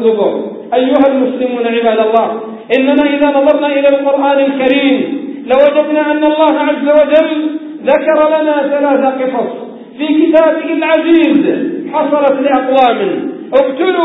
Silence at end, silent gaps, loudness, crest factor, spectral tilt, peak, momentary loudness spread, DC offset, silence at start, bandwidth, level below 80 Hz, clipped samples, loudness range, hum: 0 s; none; -11 LUFS; 10 dB; -7.5 dB/octave; 0 dBFS; 8 LU; under 0.1%; 0 s; 4 kHz; -56 dBFS; under 0.1%; 1 LU; none